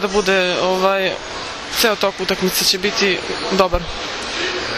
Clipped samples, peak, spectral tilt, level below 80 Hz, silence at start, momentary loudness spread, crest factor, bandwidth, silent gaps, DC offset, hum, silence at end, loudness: under 0.1%; 0 dBFS; -2.5 dB/octave; -38 dBFS; 0 s; 8 LU; 18 dB; 14 kHz; none; under 0.1%; none; 0 s; -17 LUFS